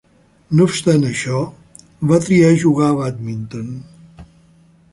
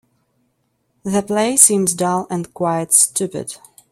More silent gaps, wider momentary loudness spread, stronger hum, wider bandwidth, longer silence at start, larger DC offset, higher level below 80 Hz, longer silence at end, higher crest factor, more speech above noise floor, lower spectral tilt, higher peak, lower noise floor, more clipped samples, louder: neither; second, 16 LU vs 19 LU; neither; second, 11.5 kHz vs 16.5 kHz; second, 0.5 s vs 1.05 s; neither; first, -52 dBFS vs -60 dBFS; first, 0.7 s vs 0.35 s; about the same, 16 dB vs 18 dB; second, 35 dB vs 50 dB; first, -6.5 dB/octave vs -3.5 dB/octave; about the same, -2 dBFS vs 0 dBFS; second, -50 dBFS vs -67 dBFS; neither; about the same, -16 LUFS vs -15 LUFS